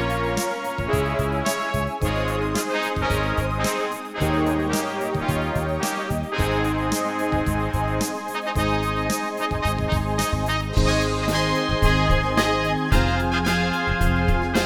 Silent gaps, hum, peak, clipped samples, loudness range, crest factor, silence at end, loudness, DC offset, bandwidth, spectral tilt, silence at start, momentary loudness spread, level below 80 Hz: none; none; -6 dBFS; under 0.1%; 3 LU; 16 dB; 0 s; -23 LUFS; under 0.1%; 18 kHz; -5 dB/octave; 0 s; 5 LU; -30 dBFS